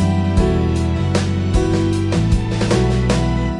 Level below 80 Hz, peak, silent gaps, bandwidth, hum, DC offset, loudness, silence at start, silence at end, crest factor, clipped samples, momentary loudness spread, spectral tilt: -24 dBFS; -2 dBFS; none; 11.5 kHz; none; under 0.1%; -17 LUFS; 0 s; 0 s; 14 dB; under 0.1%; 2 LU; -6.5 dB/octave